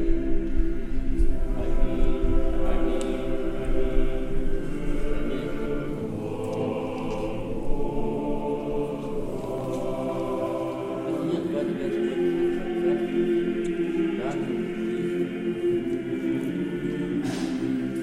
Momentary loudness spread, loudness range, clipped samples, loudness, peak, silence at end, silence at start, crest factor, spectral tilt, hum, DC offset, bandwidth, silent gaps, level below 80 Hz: 6 LU; 4 LU; under 0.1%; -28 LUFS; -8 dBFS; 0 s; 0 s; 16 dB; -7.5 dB/octave; none; under 0.1%; 9.6 kHz; none; -28 dBFS